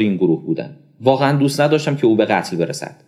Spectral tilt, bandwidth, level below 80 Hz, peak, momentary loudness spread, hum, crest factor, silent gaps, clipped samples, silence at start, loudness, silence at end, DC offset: -6.5 dB/octave; 14.5 kHz; -66 dBFS; 0 dBFS; 9 LU; none; 16 dB; none; under 0.1%; 0 s; -17 LUFS; 0.15 s; under 0.1%